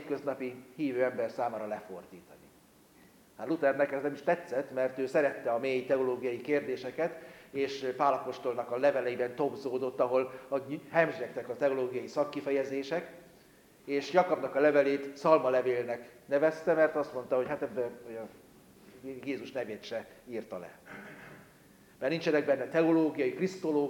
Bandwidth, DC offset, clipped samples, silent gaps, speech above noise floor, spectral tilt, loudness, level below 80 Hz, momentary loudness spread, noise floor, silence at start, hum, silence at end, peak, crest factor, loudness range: 17 kHz; under 0.1%; under 0.1%; none; 30 dB; -6 dB/octave; -32 LUFS; -76 dBFS; 15 LU; -61 dBFS; 0 s; none; 0 s; -10 dBFS; 22 dB; 9 LU